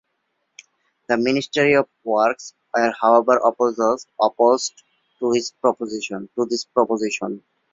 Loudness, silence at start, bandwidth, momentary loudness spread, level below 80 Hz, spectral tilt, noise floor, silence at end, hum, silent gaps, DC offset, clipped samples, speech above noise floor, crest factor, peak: -20 LUFS; 1.1 s; 7.8 kHz; 11 LU; -64 dBFS; -4 dB/octave; -73 dBFS; 0.35 s; none; none; under 0.1%; under 0.1%; 53 dB; 18 dB; -2 dBFS